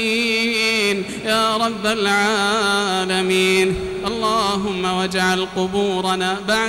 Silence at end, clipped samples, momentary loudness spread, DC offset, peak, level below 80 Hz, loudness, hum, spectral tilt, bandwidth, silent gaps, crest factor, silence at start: 0 s; under 0.1%; 5 LU; under 0.1%; -6 dBFS; -46 dBFS; -18 LUFS; none; -3.5 dB/octave; 16.5 kHz; none; 12 dB; 0 s